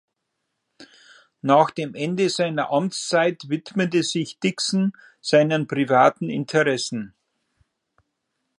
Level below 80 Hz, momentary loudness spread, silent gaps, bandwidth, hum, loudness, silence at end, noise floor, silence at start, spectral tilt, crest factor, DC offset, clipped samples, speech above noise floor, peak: -72 dBFS; 10 LU; none; 11.5 kHz; none; -21 LUFS; 1.55 s; -78 dBFS; 0.8 s; -5 dB/octave; 20 dB; under 0.1%; under 0.1%; 57 dB; -2 dBFS